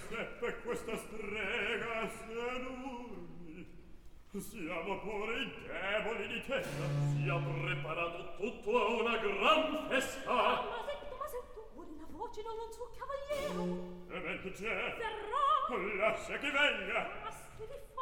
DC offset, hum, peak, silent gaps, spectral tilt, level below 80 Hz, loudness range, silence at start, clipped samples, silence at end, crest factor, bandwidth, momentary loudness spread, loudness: 0.1%; none; -16 dBFS; none; -5 dB/octave; -56 dBFS; 9 LU; 0 s; under 0.1%; 0 s; 22 dB; 18 kHz; 16 LU; -36 LUFS